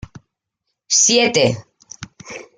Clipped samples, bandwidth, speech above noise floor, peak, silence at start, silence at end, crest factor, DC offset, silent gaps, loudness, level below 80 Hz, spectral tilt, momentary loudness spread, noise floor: under 0.1%; 11 kHz; 61 dB; -2 dBFS; 0.9 s; 0.15 s; 18 dB; under 0.1%; none; -14 LUFS; -52 dBFS; -2 dB/octave; 24 LU; -77 dBFS